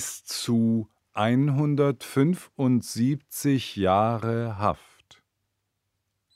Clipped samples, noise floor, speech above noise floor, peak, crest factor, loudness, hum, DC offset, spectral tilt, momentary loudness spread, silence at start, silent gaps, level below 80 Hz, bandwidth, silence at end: under 0.1%; -79 dBFS; 55 dB; -8 dBFS; 18 dB; -25 LUFS; none; under 0.1%; -6 dB/octave; 6 LU; 0 s; none; -62 dBFS; 16 kHz; 1.6 s